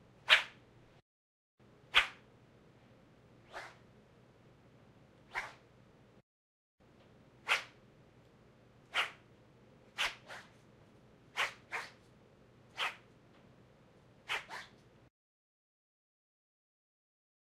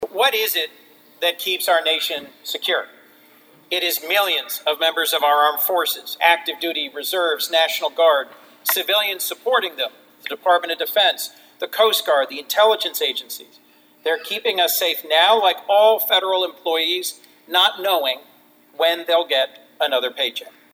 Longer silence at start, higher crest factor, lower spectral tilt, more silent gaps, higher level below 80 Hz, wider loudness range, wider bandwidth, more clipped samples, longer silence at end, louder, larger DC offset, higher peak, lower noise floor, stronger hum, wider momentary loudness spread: first, 0.25 s vs 0 s; first, 32 dB vs 20 dB; about the same, -0.5 dB/octave vs 0.5 dB/octave; first, 1.02-1.58 s, 6.23-6.78 s vs none; first, -74 dBFS vs -82 dBFS; first, 12 LU vs 4 LU; second, 16 kHz vs over 20 kHz; neither; first, 2.75 s vs 0.25 s; second, -35 LUFS vs -19 LUFS; neither; second, -10 dBFS vs 0 dBFS; first, -63 dBFS vs -52 dBFS; neither; first, 25 LU vs 11 LU